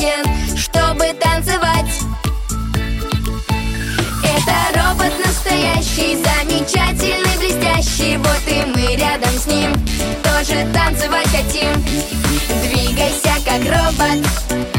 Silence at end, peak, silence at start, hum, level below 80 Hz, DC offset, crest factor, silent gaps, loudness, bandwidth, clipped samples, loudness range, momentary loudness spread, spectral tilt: 0 s; -2 dBFS; 0 s; none; -22 dBFS; under 0.1%; 14 dB; none; -16 LUFS; 17 kHz; under 0.1%; 3 LU; 6 LU; -4 dB/octave